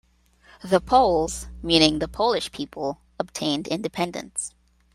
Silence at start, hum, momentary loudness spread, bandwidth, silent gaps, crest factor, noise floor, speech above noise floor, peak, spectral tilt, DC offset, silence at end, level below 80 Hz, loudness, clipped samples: 0.65 s; none; 14 LU; 15.5 kHz; none; 22 dB; -57 dBFS; 34 dB; -2 dBFS; -4 dB/octave; under 0.1%; 0.45 s; -46 dBFS; -23 LUFS; under 0.1%